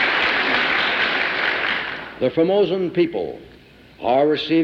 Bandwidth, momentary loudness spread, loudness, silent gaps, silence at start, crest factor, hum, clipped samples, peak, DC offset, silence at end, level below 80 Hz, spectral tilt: 7.8 kHz; 11 LU; -19 LUFS; none; 0 s; 14 dB; none; under 0.1%; -6 dBFS; under 0.1%; 0 s; -54 dBFS; -5.5 dB/octave